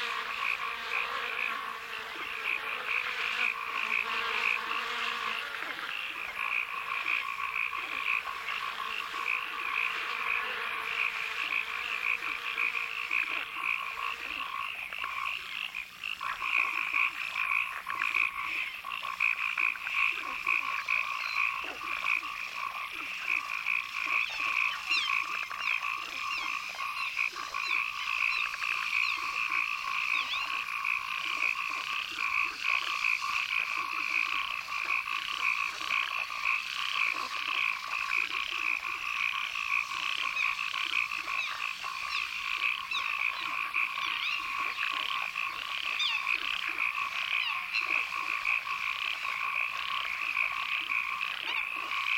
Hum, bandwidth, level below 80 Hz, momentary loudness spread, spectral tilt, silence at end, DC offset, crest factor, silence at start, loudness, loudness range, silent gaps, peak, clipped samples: none; 17 kHz; -68 dBFS; 6 LU; 0.5 dB/octave; 0 s; under 0.1%; 18 dB; 0 s; -30 LUFS; 2 LU; none; -14 dBFS; under 0.1%